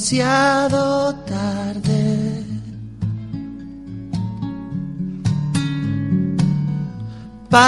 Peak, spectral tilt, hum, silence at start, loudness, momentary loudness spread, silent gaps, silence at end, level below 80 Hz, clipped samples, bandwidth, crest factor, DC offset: 0 dBFS; -5.5 dB/octave; none; 0 s; -21 LUFS; 16 LU; none; 0 s; -44 dBFS; under 0.1%; 11.5 kHz; 20 dB; under 0.1%